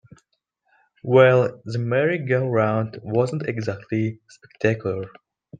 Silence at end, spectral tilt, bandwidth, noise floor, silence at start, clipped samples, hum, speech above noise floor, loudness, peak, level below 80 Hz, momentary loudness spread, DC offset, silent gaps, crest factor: 0.05 s; -8 dB/octave; 9.2 kHz; -72 dBFS; 1.05 s; under 0.1%; none; 51 dB; -22 LUFS; -2 dBFS; -62 dBFS; 13 LU; under 0.1%; none; 20 dB